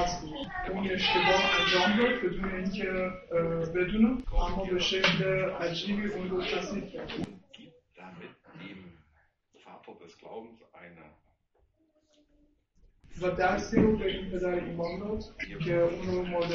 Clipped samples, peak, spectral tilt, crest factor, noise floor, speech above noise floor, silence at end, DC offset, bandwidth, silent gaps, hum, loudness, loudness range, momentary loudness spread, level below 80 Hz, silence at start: under 0.1%; -10 dBFS; -5 dB/octave; 20 dB; -71 dBFS; 42 dB; 0 s; under 0.1%; 7.4 kHz; none; none; -29 LUFS; 22 LU; 22 LU; -44 dBFS; 0 s